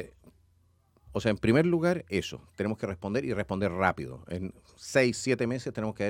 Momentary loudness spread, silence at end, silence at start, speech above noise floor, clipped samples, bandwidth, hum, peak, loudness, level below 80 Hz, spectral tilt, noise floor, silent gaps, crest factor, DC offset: 13 LU; 0 s; 0 s; 37 dB; under 0.1%; 16.5 kHz; none; -8 dBFS; -29 LUFS; -56 dBFS; -6 dB/octave; -66 dBFS; none; 22 dB; under 0.1%